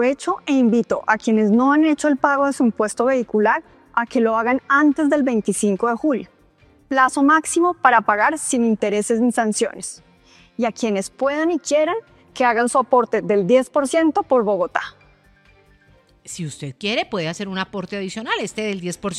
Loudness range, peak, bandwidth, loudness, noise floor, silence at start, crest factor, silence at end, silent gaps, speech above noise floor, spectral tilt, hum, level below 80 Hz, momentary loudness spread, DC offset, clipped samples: 8 LU; 0 dBFS; 13 kHz; -19 LUFS; -54 dBFS; 0 s; 18 dB; 0 s; none; 36 dB; -4.5 dB/octave; none; -60 dBFS; 11 LU; under 0.1%; under 0.1%